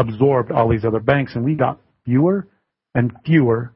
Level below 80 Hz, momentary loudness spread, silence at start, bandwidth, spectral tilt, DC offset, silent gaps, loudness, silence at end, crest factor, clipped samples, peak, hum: -46 dBFS; 6 LU; 0 s; 5.8 kHz; -13 dB/octave; under 0.1%; none; -18 LUFS; 0.05 s; 16 dB; under 0.1%; -2 dBFS; none